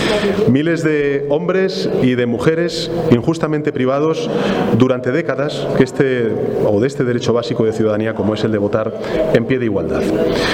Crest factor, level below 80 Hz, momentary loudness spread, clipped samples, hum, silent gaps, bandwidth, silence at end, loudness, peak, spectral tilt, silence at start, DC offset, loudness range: 16 dB; -42 dBFS; 4 LU; under 0.1%; none; none; 15.5 kHz; 0 s; -16 LUFS; 0 dBFS; -6.5 dB/octave; 0 s; under 0.1%; 1 LU